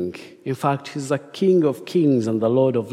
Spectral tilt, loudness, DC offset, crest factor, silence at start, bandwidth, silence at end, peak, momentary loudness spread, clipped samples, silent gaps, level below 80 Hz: -7.5 dB/octave; -21 LUFS; under 0.1%; 14 dB; 0 s; 14.5 kHz; 0 s; -6 dBFS; 11 LU; under 0.1%; none; -68 dBFS